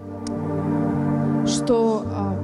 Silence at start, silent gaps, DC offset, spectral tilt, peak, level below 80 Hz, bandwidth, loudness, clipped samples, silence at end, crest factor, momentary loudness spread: 0 s; none; under 0.1%; -6.5 dB/octave; -8 dBFS; -50 dBFS; 12 kHz; -22 LUFS; under 0.1%; 0 s; 14 dB; 7 LU